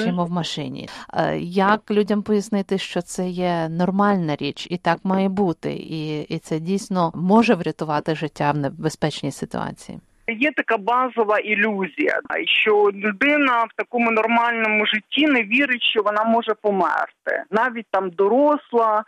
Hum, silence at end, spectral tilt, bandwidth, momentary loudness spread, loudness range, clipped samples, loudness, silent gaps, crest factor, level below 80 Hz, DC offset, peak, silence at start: none; 0.05 s; -5.5 dB/octave; 12.5 kHz; 10 LU; 4 LU; under 0.1%; -20 LUFS; none; 16 dB; -60 dBFS; under 0.1%; -4 dBFS; 0 s